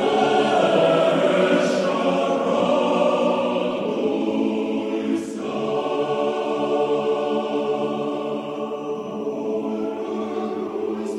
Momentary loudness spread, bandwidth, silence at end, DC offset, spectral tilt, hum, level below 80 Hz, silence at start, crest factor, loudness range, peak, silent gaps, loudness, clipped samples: 9 LU; 11.5 kHz; 0 s; under 0.1%; -5.5 dB/octave; none; -68 dBFS; 0 s; 16 dB; 7 LU; -6 dBFS; none; -22 LUFS; under 0.1%